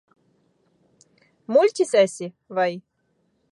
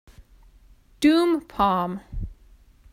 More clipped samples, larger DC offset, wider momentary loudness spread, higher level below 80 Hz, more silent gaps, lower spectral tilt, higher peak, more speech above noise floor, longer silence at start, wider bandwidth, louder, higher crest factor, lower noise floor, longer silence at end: neither; neither; about the same, 18 LU vs 18 LU; second, -80 dBFS vs -42 dBFS; neither; second, -4.5 dB/octave vs -6 dB/octave; about the same, -6 dBFS vs -8 dBFS; first, 48 dB vs 33 dB; first, 1.5 s vs 0.2 s; second, 11.5 kHz vs 16 kHz; about the same, -21 LUFS vs -22 LUFS; about the same, 18 dB vs 18 dB; first, -69 dBFS vs -53 dBFS; first, 0.75 s vs 0.6 s